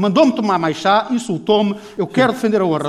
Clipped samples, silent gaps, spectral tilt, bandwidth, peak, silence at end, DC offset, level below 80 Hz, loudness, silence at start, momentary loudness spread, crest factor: under 0.1%; none; -6 dB/octave; 13.5 kHz; -2 dBFS; 0 s; under 0.1%; -60 dBFS; -17 LUFS; 0 s; 7 LU; 14 dB